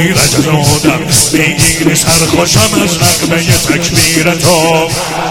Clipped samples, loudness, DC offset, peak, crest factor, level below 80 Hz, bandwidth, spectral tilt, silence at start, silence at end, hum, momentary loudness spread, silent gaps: 0.8%; -8 LUFS; under 0.1%; 0 dBFS; 10 dB; -30 dBFS; over 20 kHz; -3.5 dB/octave; 0 s; 0 s; none; 2 LU; none